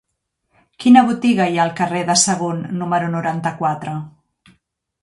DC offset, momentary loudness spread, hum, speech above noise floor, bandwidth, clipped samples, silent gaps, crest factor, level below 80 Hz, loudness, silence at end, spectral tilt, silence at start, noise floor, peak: under 0.1%; 13 LU; none; 57 dB; 11.5 kHz; under 0.1%; none; 18 dB; -60 dBFS; -17 LUFS; 0.95 s; -4 dB/octave; 0.8 s; -73 dBFS; 0 dBFS